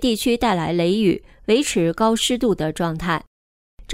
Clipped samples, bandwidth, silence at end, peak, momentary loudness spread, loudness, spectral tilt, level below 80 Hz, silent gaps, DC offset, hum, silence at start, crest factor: under 0.1%; 16 kHz; 0 s; -6 dBFS; 6 LU; -20 LUFS; -4.5 dB/octave; -42 dBFS; 3.27-3.77 s; under 0.1%; none; 0 s; 14 dB